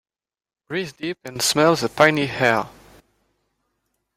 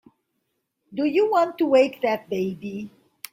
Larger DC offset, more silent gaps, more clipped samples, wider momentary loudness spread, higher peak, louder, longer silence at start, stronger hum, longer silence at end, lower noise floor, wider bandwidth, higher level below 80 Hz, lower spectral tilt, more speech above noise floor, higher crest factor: neither; neither; neither; second, 13 LU vs 17 LU; first, 0 dBFS vs -6 dBFS; about the same, -20 LUFS vs -22 LUFS; second, 0.7 s vs 0.9 s; neither; first, 1.45 s vs 0.45 s; first, under -90 dBFS vs -76 dBFS; about the same, 16.5 kHz vs 16 kHz; first, -58 dBFS vs -70 dBFS; second, -3.5 dB/octave vs -6 dB/octave; first, over 70 dB vs 54 dB; about the same, 22 dB vs 18 dB